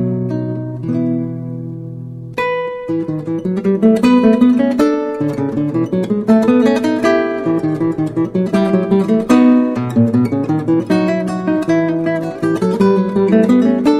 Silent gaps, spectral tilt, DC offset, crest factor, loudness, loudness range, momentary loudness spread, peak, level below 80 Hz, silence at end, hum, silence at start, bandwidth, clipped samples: none; -8 dB/octave; under 0.1%; 14 dB; -15 LUFS; 4 LU; 10 LU; 0 dBFS; -50 dBFS; 0 s; none; 0 s; 12 kHz; under 0.1%